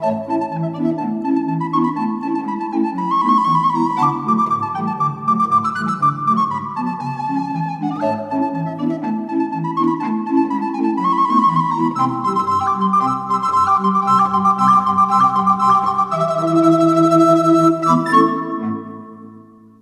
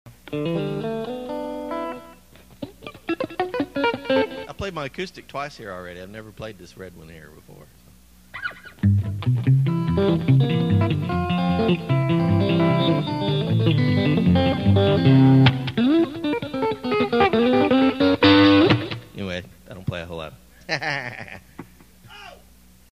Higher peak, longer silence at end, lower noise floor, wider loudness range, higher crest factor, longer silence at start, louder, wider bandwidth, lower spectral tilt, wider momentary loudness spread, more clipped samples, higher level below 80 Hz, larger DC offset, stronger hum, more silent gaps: about the same, 0 dBFS vs -2 dBFS; second, 0.4 s vs 0.55 s; second, -42 dBFS vs -52 dBFS; second, 6 LU vs 13 LU; about the same, 16 dB vs 20 dB; about the same, 0 s vs 0.05 s; first, -17 LUFS vs -21 LUFS; about the same, 12.5 kHz vs 13 kHz; about the same, -7.5 dB/octave vs -8 dB/octave; second, 9 LU vs 21 LU; neither; second, -58 dBFS vs -48 dBFS; second, under 0.1% vs 0.1%; neither; neither